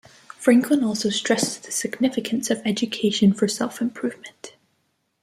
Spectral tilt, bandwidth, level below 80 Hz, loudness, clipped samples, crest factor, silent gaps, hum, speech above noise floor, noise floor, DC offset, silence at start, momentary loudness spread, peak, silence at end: -4 dB/octave; 15.5 kHz; -66 dBFS; -22 LUFS; under 0.1%; 20 dB; none; none; 49 dB; -71 dBFS; under 0.1%; 0.4 s; 12 LU; -4 dBFS; 0.75 s